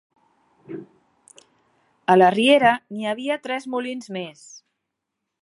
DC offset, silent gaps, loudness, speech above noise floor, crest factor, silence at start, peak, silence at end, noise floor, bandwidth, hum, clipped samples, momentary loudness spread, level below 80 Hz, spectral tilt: under 0.1%; none; -20 LUFS; 61 dB; 22 dB; 0.7 s; -2 dBFS; 0.85 s; -81 dBFS; 11.5 kHz; none; under 0.1%; 23 LU; -72 dBFS; -5 dB/octave